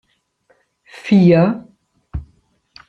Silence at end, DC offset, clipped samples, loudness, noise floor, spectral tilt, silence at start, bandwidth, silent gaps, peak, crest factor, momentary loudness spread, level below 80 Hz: 0.65 s; under 0.1%; under 0.1%; -13 LUFS; -60 dBFS; -9 dB/octave; 1.05 s; 6.6 kHz; none; -2 dBFS; 16 dB; 21 LU; -42 dBFS